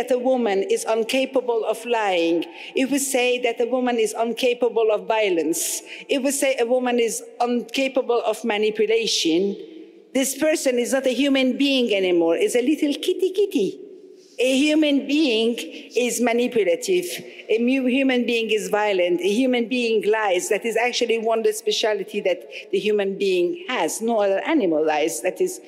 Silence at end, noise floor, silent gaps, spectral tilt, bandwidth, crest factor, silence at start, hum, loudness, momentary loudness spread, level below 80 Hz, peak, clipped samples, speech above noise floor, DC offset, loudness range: 0 s; -45 dBFS; none; -3 dB/octave; 16 kHz; 14 dB; 0 s; none; -21 LUFS; 5 LU; -74 dBFS; -8 dBFS; under 0.1%; 24 dB; under 0.1%; 2 LU